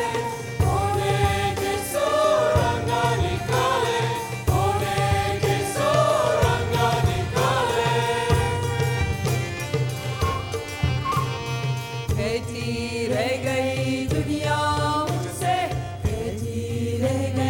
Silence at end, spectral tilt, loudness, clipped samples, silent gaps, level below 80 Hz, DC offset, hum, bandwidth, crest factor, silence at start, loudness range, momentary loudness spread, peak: 0 s; -5 dB/octave; -23 LUFS; under 0.1%; none; -38 dBFS; under 0.1%; none; 18.5 kHz; 16 dB; 0 s; 4 LU; 7 LU; -6 dBFS